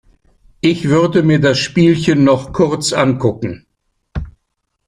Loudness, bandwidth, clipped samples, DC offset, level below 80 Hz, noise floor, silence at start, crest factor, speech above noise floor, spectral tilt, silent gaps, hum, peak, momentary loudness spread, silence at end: -14 LUFS; 11.5 kHz; under 0.1%; under 0.1%; -38 dBFS; -70 dBFS; 0.65 s; 14 dB; 57 dB; -6 dB/octave; none; none; 0 dBFS; 16 LU; 0.55 s